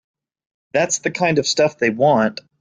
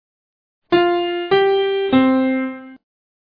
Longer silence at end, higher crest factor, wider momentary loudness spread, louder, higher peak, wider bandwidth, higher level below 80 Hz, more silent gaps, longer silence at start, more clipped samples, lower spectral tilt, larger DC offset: second, 0.25 s vs 0.45 s; about the same, 16 dB vs 16 dB; about the same, 6 LU vs 8 LU; about the same, -18 LUFS vs -17 LUFS; about the same, -4 dBFS vs -4 dBFS; first, 9.6 kHz vs 5 kHz; about the same, -60 dBFS vs -58 dBFS; neither; about the same, 0.75 s vs 0.7 s; neither; second, -3.5 dB/octave vs -8 dB/octave; neither